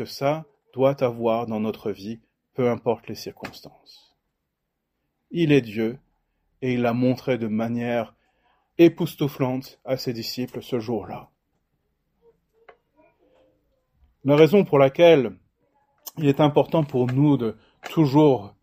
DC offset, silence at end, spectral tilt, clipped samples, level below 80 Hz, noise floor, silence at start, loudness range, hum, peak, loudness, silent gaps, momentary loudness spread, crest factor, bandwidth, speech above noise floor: under 0.1%; 0.15 s; -7.5 dB/octave; under 0.1%; -62 dBFS; -79 dBFS; 0 s; 12 LU; none; -2 dBFS; -22 LUFS; none; 20 LU; 22 dB; 16 kHz; 57 dB